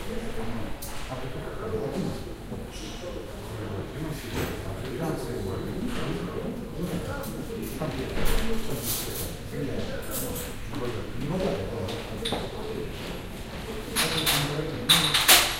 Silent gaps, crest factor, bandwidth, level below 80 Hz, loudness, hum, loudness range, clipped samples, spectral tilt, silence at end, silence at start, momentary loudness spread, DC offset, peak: none; 26 dB; 16 kHz; -38 dBFS; -29 LUFS; none; 6 LU; under 0.1%; -3 dB/octave; 0 s; 0 s; 13 LU; under 0.1%; -2 dBFS